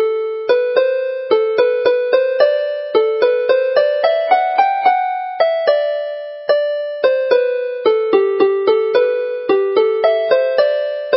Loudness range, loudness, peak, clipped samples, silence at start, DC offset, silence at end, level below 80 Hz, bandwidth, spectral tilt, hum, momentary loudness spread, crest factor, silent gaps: 1 LU; -15 LUFS; 0 dBFS; under 0.1%; 0 s; under 0.1%; 0 s; -74 dBFS; 5.8 kHz; -7.5 dB/octave; none; 5 LU; 14 dB; none